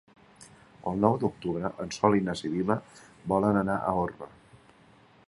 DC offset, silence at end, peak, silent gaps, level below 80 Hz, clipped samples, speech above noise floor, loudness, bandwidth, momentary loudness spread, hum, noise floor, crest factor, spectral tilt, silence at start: under 0.1%; 1 s; -6 dBFS; none; -56 dBFS; under 0.1%; 30 dB; -28 LUFS; 11.5 kHz; 11 LU; none; -58 dBFS; 24 dB; -7 dB/octave; 0.4 s